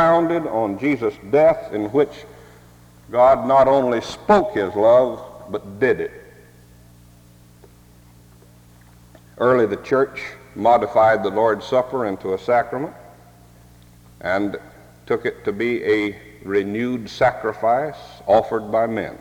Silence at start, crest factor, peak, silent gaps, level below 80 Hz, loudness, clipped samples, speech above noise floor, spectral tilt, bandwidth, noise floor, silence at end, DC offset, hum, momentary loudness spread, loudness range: 0 s; 18 dB; -2 dBFS; none; -52 dBFS; -19 LUFS; under 0.1%; 29 dB; -6.5 dB/octave; 17 kHz; -48 dBFS; 0.05 s; under 0.1%; 60 Hz at -60 dBFS; 14 LU; 9 LU